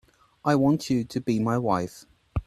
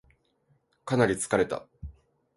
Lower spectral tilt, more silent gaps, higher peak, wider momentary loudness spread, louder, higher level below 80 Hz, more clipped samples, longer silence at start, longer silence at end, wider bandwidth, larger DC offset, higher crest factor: first, -7 dB/octave vs -5 dB/octave; neither; about the same, -8 dBFS vs -10 dBFS; second, 10 LU vs 22 LU; about the same, -25 LUFS vs -27 LUFS; first, -46 dBFS vs -52 dBFS; neither; second, 0.45 s vs 0.85 s; second, 0.05 s vs 0.45 s; first, 13.5 kHz vs 12 kHz; neither; about the same, 18 dB vs 20 dB